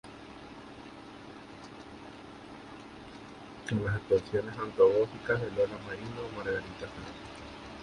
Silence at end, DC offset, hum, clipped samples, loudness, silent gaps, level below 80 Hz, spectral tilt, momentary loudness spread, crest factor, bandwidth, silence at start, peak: 0 s; under 0.1%; none; under 0.1%; -32 LUFS; none; -58 dBFS; -6.5 dB/octave; 19 LU; 22 dB; 10.5 kHz; 0.05 s; -12 dBFS